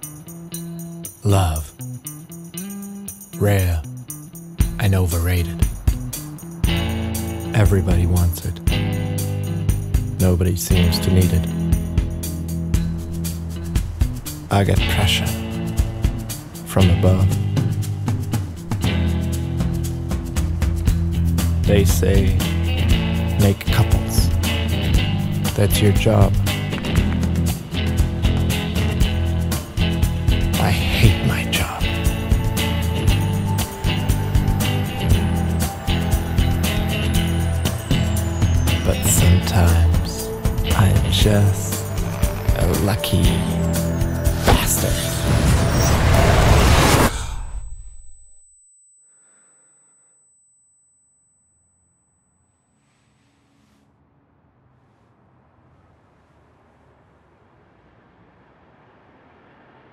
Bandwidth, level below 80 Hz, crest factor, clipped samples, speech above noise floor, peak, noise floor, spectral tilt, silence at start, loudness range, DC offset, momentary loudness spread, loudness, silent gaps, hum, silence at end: 16.5 kHz; -26 dBFS; 18 dB; under 0.1%; 48 dB; 0 dBFS; -64 dBFS; -5.5 dB/octave; 0 s; 5 LU; under 0.1%; 11 LU; -19 LUFS; none; none; 11.8 s